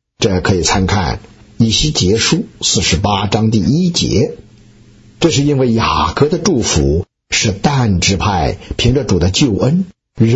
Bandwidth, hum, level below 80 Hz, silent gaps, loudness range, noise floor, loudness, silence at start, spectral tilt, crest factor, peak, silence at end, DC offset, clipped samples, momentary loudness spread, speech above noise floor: 8.2 kHz; none; -30 dBFS; none; 1 LU; -43 dBFS; -13 LUFS; 0.2 s; -4.5 dB/octave; 12 dB; 0 dBFS; 0 s; under 0.1%; under 0.1%; 5 LU; 30 dB